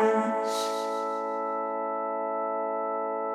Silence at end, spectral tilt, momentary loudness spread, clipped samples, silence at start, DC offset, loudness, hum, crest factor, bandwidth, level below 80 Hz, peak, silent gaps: 0 s; -4 dB/octave; 3 LU; under 0.1%; 0 s; under 0.1%; -30 LUFS; none; 16 dB; 14.5 kHz; under -90 dBFS; -12 dBFS; none